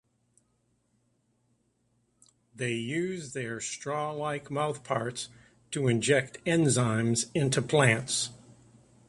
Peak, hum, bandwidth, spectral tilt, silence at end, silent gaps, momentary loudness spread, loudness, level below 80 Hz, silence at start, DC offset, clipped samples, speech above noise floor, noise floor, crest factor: -8 dBFS; 60 Hz at -60 dBFS; 11.5 kHz; -4.5 dB/octave; 0.7 s; none; 11 LU; -29 LUFS; -64 dBFS; 2.55 s; under 0.1%; under 0.1%; 44 dB; -73 dBFS; 22 dB